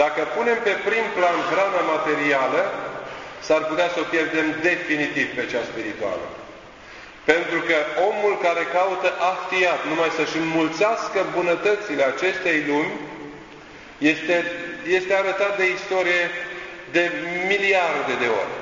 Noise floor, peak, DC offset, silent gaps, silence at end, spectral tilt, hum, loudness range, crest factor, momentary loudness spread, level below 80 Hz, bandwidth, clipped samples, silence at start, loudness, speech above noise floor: -42 dBFS; -2 dBFS; under 0.1%; none; 0 s; -4 dB/octave; none; 3 LU; 20 dB; 13 LU; -60 dBFS; 7.6 kHz; under 0.1%; 0 s; -21 LUFS; 20 dB